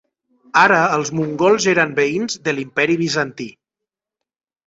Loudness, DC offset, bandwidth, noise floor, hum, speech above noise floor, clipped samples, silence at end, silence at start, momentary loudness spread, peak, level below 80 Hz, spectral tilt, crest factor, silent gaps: -17 LUFS; under 0.1%; 8 kHz; -85 dBFS; none; 68 dB; under 0.1%; 1.2 s; 0.55 s; 9 LU; 0 dBFS; -60 dBFS; -4 dB/octave; 18 dB; none